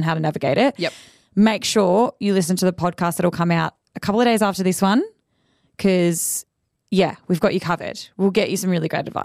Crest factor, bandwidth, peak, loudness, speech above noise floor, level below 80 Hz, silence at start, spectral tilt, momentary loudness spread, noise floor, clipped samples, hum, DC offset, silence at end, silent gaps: 14 dB; 15.5 kHz; -6 dBFS; -20 LUFS; 46 dB; -58 dBFS; 0 s; -5 dB/octave; 8 LU; -65 dBFS; under 0.1%; none; under 0.1%; 0 s; none